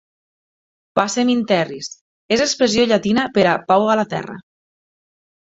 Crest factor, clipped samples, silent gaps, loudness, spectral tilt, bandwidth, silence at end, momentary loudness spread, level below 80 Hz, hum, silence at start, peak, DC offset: 18 dB; under 0.1%; 2.01-2.29 s; -17 LUFS; -4 dB/octave; 8 kHz; 1.1 s; 13 LU; -56 dBFS; none; 0.95 s; 0 dBFS; under 0.1%